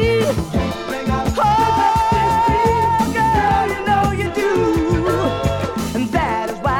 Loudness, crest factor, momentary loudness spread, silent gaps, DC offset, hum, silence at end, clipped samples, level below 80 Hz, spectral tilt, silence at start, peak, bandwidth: -17 LUFS; 12 dB; 6 LU; none; under 0.1%; none; 0 s; under 0.1%; -30 dBFS; -6 dB/octave; 0 s; -4 dBFS; 18 kHz